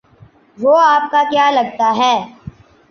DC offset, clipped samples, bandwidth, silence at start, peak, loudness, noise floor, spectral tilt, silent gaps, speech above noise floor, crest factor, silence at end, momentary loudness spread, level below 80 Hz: under 0.1%; under 0.1%; 6.8 kHz; 0.6 s; -2 dBFS; -13 LUFS; -46 dBFS; -4 dB/octave; none; 33 dB; 12 dB; 0.4 s; 8 LU; -54 dBFS